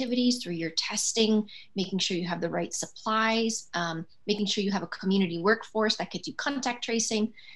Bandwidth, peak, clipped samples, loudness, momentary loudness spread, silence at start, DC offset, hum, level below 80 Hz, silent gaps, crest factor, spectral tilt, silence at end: 12.5 kHz; -10 dBFS; under 0.1%; -28 LUFS; 7 LU; 0 s; 0.3%; none; -76 dBFS; none; 20 dB; -3.5 dB/octave; 0 s